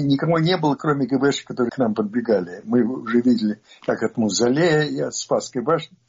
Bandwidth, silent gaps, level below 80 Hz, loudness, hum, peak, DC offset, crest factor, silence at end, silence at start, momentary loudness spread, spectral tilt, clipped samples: 7.6 kHz; none; -62 dBFS; -21 LUFS; none; -6 dBFS; under 0.1%; 14 dB; 0.2 s; 0 s; 6 LU; -5.5 dB/octave; under 0.1%